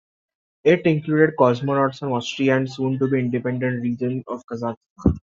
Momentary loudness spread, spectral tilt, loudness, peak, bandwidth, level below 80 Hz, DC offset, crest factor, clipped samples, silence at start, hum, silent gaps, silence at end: 11 LU; -7.5 dB/octave; -21 LUFS; -4 dBFS; 7.6 kHz; -44 dBFS; under 0.1%; 18 dB; under 0.1%; 0.65 s; none; 4.77-4.81 s, 4.90-4.96 s; 0.05 s